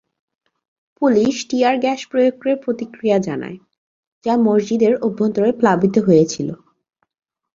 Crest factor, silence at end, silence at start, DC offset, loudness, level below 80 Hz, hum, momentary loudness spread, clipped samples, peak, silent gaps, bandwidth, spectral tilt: 16 dB; 1 s; 1 s; under 0.1%; -17 LUFS; -60 dBFS; none; 11 LU; under 0.1%; -2 dBFS; 3.78-4.21 s; 7.6 kHz; -6 dB/octave